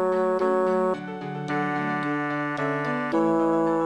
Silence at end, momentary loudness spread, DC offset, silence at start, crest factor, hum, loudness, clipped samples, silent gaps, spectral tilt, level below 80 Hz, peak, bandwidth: 0 s; 6 LU; under 0.1%; 0 s; 14 dB; none; -25 LUFS; under 0.1%; none; -7.5 dB/octave; -70 dBFS; -12 dBFS; 11 kHz